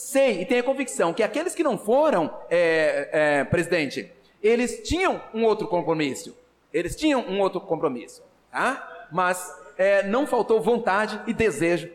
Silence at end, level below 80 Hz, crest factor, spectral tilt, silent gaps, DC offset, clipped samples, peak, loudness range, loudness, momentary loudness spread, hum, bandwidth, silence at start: 0 s; -50 dBFS; 12 dB; -4.5 dB/octave; none; under 0.1%; under 0.1%; -12 dBFS; 4 LU; -23 LUFS; 8 LU; none; 16 kHz; 0 s